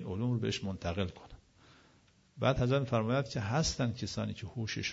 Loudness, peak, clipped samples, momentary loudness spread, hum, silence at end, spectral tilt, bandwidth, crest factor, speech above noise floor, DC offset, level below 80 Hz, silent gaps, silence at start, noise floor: -34 LUFS; -14 dBFS; under 0.1%; 8 LU; none; 0 s; -5.5 dB/octave; 7.6 kHz; 20 dB; 32 dB; under 0.1%; -54 dBFS; none; 0 s; -66 dBFS